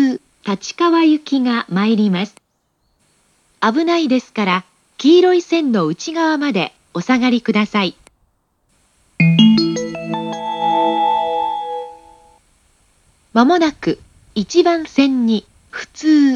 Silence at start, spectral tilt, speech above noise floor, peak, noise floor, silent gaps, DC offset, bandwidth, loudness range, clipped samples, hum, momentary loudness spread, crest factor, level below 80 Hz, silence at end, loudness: 0 s; -6 dB/octave; 51 dB; 0 dBFS; -66 dBFS; none; under 0.1%; 9.8 kHz; 4 LU; under 0.1%; none; 12 LU; 16 dB; -58 dBFS; 0 s; -16 LUFS